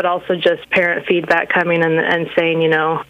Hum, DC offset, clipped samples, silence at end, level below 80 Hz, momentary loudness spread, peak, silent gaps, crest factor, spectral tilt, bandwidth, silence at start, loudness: none; under 0.1%; under 0.1%; 0.05 s; -58 dBFS; 2 LU; 0 dBFS; none; 16 dB; -6.5 dB/octave; 8.2 kHz; 0 s; -15 LUFS